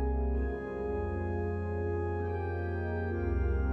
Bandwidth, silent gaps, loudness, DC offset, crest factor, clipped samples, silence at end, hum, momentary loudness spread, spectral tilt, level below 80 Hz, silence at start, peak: 4.2 kHz; none; -34 LUFS; under 0.1%; 10 dB; under 0.1%; 0 s; none; 3 LU; -10.5 dB/octave; -36 dBFS; 0 s; -22 dBFS